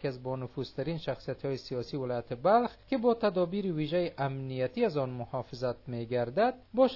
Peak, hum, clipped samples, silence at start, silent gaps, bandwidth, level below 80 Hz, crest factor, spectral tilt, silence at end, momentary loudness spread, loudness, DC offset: -12 dBFS; none; under 0.1%; 0 s; none; 6 kHz; -60 dBFS; 18 dB; -8 dB/octave; 0 s; 9 LU; -32 LUFS; under 0.1%